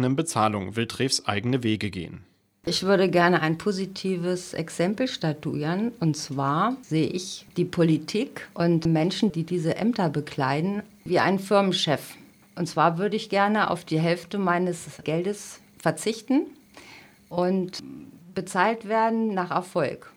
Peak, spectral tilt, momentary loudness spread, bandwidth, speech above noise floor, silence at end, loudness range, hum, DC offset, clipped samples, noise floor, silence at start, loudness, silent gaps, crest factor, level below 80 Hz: -6 dBFS; -5.5 dB/octave; 11 LU; 16 kHz; 25 dB; 0.05 s; 4 LU; none; under 0.1%; under 0.1%; -50 dBFS; 0 s; -25 LUFS; none; 20 dB; -62 dBFS